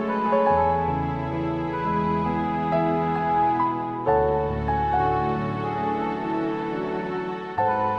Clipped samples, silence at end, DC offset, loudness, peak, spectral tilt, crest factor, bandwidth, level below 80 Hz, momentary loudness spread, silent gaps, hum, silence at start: under 0.1%; 0 s; under 0.1%; -24 LUFS; -8 dBFS; -9 dB/octave; 14 dB; 7 kHz; -42 dBFS; 6 LU; none; none; 0 s